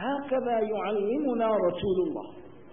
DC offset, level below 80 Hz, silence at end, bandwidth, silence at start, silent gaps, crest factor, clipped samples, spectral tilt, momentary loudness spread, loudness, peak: 0.3%; -60 dBFS; 0.05 s; 3.7 kHz; 0 s; none; 14 dB; under 0.1%; -10.5 dB/octave; 6 LU; -28 LUFS; -16 dBFS